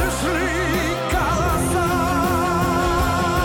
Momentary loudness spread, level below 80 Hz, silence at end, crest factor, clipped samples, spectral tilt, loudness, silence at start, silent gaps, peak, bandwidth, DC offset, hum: 2 LU; -30 dBFS; 0 s; 10 dB; under 0.1%; -5 dB/octave; -20 LUFS; 0 s; none; -10 dBFS; 17.5 kHz; under 0.1%; none